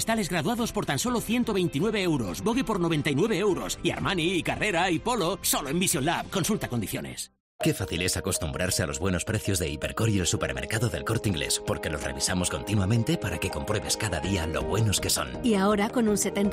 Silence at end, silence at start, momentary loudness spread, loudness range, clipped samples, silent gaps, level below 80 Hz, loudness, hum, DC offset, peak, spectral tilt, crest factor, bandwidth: 0 s; 0 s; 5 LU; 2 LU; under 0.1%; 7.40-7.59 s; -46 dBFS; -27 LUFS; none; under 0.1%; -12 dBFS; -4 dB/octave; 14 dB; 16 kHz